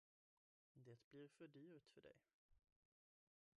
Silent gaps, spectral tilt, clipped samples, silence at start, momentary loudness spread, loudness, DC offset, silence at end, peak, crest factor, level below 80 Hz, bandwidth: 1.04-1.11 s, 2.34-2.49 s; -6 dB/octave; under 0.1%; 0.75 s; 5 LU; -66 LUFS; under 0.1%; 1 s; -52 dBFS; 18 dB; under -90 dBFS; 8 kHz